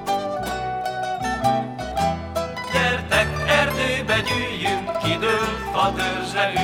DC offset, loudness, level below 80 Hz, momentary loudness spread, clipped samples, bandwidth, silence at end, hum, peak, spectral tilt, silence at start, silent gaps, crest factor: under 0.1%; -22 LUFS; -40 dBFS; 7 LU; under 0.1%; 19 kHz; 0 s; none; -4 dBFS; -4 dB/octave; 0 s; none; 18 dB